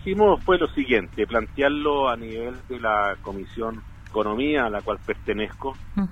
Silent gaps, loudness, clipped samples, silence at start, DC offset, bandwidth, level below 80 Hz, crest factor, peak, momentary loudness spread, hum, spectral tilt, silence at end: none; -24 LUFS; under 0.1%; 0 s; under 0.1%; 8.4 kHz; -40 dBFS; 18 dB; -6 dBFS; 12 LU; none; -7 dB/octave; 0 s